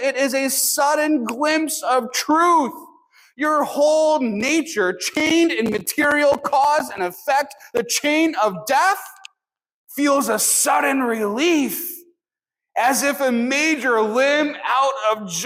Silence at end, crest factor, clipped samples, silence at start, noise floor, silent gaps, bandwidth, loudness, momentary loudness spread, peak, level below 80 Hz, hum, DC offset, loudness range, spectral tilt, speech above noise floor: 0 s; 14 dB; under 0.1%; 0 s; -88 dBFS; 9.74-9.87 s; 16.5 kHz; -19 LUFS; 7 LU; -6 dBFS; -66 dBFS; none; under 0.1%; 2 LU; -2 dB/octave; 69 dB